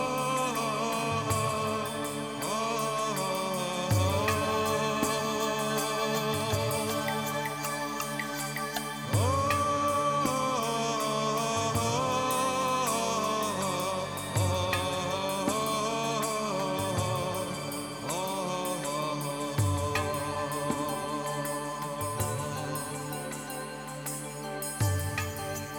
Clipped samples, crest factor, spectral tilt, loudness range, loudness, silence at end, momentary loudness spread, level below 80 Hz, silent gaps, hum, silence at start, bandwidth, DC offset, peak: under 0.1%; 16 dB; -4 dB/octave; 5 LU; -30 LUFS; 0 s; 6 LU; -56 dBFS; none; none; 0 s; over 20 kHz; under 0.1%; -14 dBFS